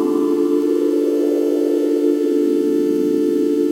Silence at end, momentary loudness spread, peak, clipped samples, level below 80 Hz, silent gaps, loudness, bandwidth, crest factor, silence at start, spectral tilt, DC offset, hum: 0 s; 1 LU; -6 dBFS; under 0.1%; -76 dBFS; none; -17 LUFS; 16 kHz; 10 dB; 0 s; -6.5 dB/octave; under 0.1%; none